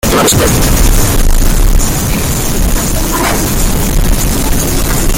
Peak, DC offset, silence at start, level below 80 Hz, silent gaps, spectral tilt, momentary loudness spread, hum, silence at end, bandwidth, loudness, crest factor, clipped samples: 0 dBFS; under 0.1%; 0.05 s; -12 dBFS; none; -4 dB/octave; 4 LU; none; 0 s; 17.5 kHz; -11 LUFS; 8 dB; under 0.1%